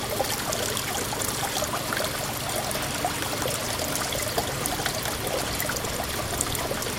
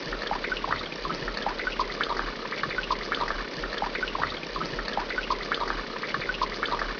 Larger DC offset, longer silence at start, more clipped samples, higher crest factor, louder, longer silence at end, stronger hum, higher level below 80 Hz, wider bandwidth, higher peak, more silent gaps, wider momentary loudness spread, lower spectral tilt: neither; about the same, 0 s vs 0 s; neither; first, 26 dB vs 20 dB; first, -27 LUFS vs -30 LUFS; about the same, 0 s vs 0 s; neither; about the same, -44 dBFS vs -44 dBFS; first, 17 kHz vs 5.4 kHz; first, -2 dBFS vs -12 dBFS; neither; about the same, 2 LU vs 3 LU; second, -2.5 dB/octave vs -4 dB/octave